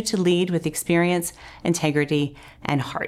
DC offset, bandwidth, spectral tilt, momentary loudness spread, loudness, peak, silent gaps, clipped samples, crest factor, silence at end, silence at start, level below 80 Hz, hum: under 0.1%; 15 kHz; -5 dB/octave; 9 LU; -23 LUFS; -8 dBFS; none; under 0.1%; 14 dB; 0 s; 0 s; -54 dBFS; none